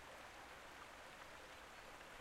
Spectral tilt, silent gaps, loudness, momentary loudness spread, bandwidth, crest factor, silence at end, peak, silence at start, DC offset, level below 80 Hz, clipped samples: -2.5 dB/octave; none; -57 LUFS; 0 LU; 16 kHz; 16 dB; 0 s; -42 dBFS; 0 s; under 0.1%; -72 dBFS; under 0.1%